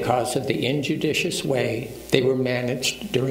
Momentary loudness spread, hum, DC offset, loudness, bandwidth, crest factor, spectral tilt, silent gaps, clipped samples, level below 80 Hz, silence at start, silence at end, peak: 3 LU; none; under 0.1%; -23 LUFS; 16 kHz; 22 dB; -4.5 dB/octave; none; under 0.1%; -52 dBFS; 0 s; 0 s; 0 dBFS